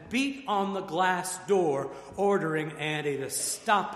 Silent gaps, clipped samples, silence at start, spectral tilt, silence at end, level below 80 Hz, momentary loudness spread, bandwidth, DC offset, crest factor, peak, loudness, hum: none; under 0.1%; 0 s; -3.5 dB/octave; 0 s; -66 dBFS; 5 LU; 14.5 kHz; under 0.1%; 18 dB; -10 dBFS; -29 LUFS; none